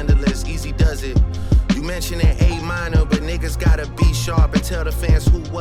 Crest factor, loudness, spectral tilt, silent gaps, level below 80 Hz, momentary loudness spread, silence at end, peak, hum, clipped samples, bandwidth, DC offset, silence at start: 12 dB; -19 LUFS; -6 dB/octave; none; -18 dBFS; 6 LU; 0 s; -4 dBFS; none; under 0.1%; 15 kHz; under 0.1%; 0 s